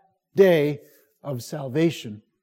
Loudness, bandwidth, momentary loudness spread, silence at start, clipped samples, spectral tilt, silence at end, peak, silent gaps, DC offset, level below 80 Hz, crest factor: -22 LUFS; 16.5 kHz; 19 LU; 0.35 s; under 0.1%; -6.5 dB/octave; 0.25 s; -4 dBFS; none; under 0.1%; -72 dBFS; 18 dB